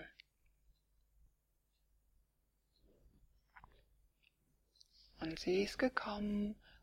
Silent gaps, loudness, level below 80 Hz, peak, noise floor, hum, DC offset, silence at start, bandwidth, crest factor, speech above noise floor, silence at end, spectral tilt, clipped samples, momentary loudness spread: none; -40 LUFS; -66 dBFS; -20 dBFS; -81 dBFS; none; under 0.1%; 0 s; 15.5 kHz; 26 dB; 42 dB; 0.05 s; -5.5 dB/octave; under 0.1%; 10 LU